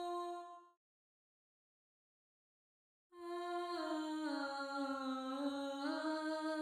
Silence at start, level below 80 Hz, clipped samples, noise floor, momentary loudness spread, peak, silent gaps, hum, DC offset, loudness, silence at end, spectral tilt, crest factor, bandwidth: 0 s; -88 dBFS; under 0.1%; under -90 dBFS; 8 LU; -30 dBFS; 0.77-3.10 s; none; under 0.1%; -42 LUFS; 0 s; -2.5 dB/octave; 14 dB; 15.5 kHz